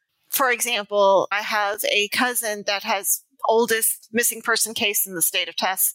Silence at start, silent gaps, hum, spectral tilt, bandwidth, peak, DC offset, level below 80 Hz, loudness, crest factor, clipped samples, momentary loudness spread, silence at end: 0.3 s; none; none; -0.5 dB/octave; 16.5 kHz; -8 dBFS; under 0.1%; -76 dBFS; -21 LUFS; 14 dB; under 0.1%; 5 LU; 0 s